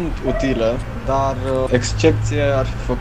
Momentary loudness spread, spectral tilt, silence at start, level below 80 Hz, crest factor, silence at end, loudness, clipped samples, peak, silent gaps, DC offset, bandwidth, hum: 5 LU; -6 dB/octave; 0 s; -28 dBFS; 18 dB; 0 s; -19 LUFS; under 0.1%; 0 dBFS; none; 1%; 10.5 kHz; none